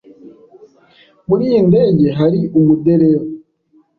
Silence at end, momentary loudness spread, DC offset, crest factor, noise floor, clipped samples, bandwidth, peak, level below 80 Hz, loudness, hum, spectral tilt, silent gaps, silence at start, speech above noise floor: 0.6 s; 13 LU; under 0.1%; 12 dB; -54 dBFS; under 0.1%; 4.7 kHz; -2 dBFS; -50 dBFS; -13 LUFS; none; -11.5 dB/octave; none; 0.25 s; 43 dB